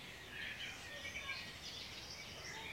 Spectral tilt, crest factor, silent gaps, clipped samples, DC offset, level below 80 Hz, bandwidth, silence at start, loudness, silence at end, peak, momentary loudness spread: -2 dB/octave; 16 dB; none; under 0.1%; under 0.1%; -66 dBFS; 16 kHz; 0 s; -46 LUFS; 0 s; -32 dBFS; 4 LU